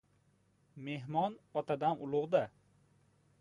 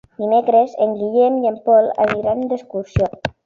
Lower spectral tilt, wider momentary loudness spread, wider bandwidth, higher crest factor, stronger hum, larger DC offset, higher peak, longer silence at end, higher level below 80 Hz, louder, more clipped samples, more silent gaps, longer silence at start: about the same, -8 dB/octave vs -8 dB/octave; first, 11 LU vs 8 LU; first, 11 kHz vs 7 kHz; first, 20 dB vs 14 dB; neither; neither; second, -18 dBFS vs -2 dBFS; first, 0.9 s vs 0.15 s; second, -78 dBFS vs -40 dBFS; second, -36 LUFS vs -17 LUFS; neither; neither; first, 0.75 s vs 0.2 s